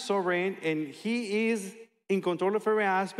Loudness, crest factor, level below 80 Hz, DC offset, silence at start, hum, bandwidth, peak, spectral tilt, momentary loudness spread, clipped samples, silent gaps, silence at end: -29 LUFS; 12 dB; -88 dBFS; under 0.1%; 0 s; none; 13.5 kHz; -16 dBFS; -5.5 dB/octave; 6 LU; under 0.1%; none; 0 s